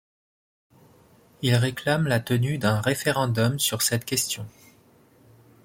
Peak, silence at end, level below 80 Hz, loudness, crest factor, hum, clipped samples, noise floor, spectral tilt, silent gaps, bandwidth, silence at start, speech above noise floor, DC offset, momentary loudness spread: -6 dBFS; 1.15 s; -60 dBFS; -24 LUFS; 20 dB; none; under 0.1%; -57 dBFS; -4.5 dB/octave; none; 16.5 kHz; 1.4 s; 33 dB; under 0.1%; 5 LU